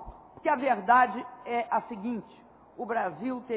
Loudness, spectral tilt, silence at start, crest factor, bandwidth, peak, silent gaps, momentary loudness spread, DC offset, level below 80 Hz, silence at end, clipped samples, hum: -29 LUFS; -3.5 dB/octave; 0 s; 20 dB; 4 kHz; -10 dBFS; none; 16 LU; under 0.1%; -60 dBFS; 0 s; under 0.1%; none